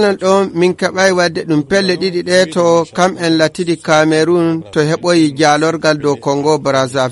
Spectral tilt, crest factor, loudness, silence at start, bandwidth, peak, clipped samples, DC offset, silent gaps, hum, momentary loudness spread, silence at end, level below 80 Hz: -5 dB/octave; 12 dB; -13 LUFS; 0 s; 11.5 kHz; 0 dBFS; under 0.1%; under 0.1%; none; none; 4 LU; 0 s; -52 dBFS